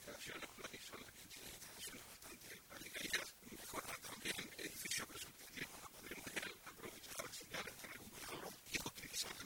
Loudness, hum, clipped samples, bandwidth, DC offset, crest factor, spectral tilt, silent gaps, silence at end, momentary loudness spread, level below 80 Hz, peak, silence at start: -48 LUFS; none; under 0.1%; 18 kHz; under 0.1%; 24 dB; -1.5 dB/octave; none; 0 s; 10 LU; -72 dBFS; -26 dBFS; 0 s